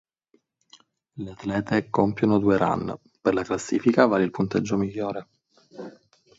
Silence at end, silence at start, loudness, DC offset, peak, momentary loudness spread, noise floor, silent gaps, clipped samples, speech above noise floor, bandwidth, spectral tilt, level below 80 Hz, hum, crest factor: 0.5 s; 1.15 s; -24 LUFS; under 0.1%; -2 dBFS; 18 LU; -67 dBFS; none; under 0.1%; 44 dB; 8 kHz; -6.5 dB/octave; -56 dBFS; none; 22 dB